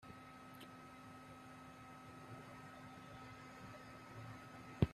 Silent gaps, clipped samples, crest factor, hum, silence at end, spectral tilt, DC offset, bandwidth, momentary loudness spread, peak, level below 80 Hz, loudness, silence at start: none; under 0.1%; 30 dB; none; 0 s; -7 dB/octave; under 0.1%; 14 kHz; 3 LU; -20 dBFS; -64 dBFS; -54 LUFS; 0 s